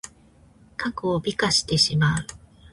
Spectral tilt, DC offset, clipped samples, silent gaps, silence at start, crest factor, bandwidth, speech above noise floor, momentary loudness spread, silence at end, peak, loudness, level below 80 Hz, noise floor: -4 dB/octave; under 0.1%; under 0.1%; none; 0.05 s; 18 dB; 11.5 kHz; 31 dB; 19 LU; 0.35 s; -6 dBFS; -22 LUFS; -48 dBFS; -54 dBFS